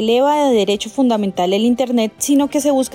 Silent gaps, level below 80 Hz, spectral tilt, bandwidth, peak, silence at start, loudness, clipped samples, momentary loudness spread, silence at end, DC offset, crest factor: none; -54 dBFS; -4 dB/octave; 16.5 kHz; -6 dBFS; 0 s; -16 LUFS; under 0.1%; 4 LU; 0.05 s; under 0.1%; 10 dB